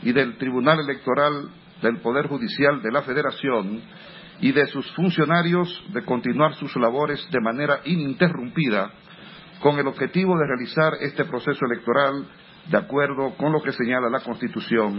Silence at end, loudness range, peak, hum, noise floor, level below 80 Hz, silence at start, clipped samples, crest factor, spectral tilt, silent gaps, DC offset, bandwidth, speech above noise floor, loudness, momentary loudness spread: 0 s; 1 LU; -2 dBFS; none; -44 dBFS; -64 dBFS; 0 s; under 0.1%; 20 dB; -11 dB/octave; none; under 0.1%; 5.8 kHz; 21 dB; -23 LUFS; 9 LU